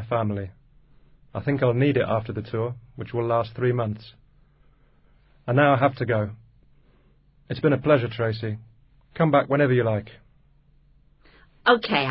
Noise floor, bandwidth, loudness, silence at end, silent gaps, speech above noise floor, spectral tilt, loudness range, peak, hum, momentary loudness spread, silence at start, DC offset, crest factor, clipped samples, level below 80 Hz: -58 dBFS; 5.8 kHz; -23 LUFS; 0 s; none; 36 dB; -11.5 dB/octave; 3 LU; -4 dBFS; none; 14 LU; 0 s; under 0.1%; 22 dB; under 0.1%; -54 dBFS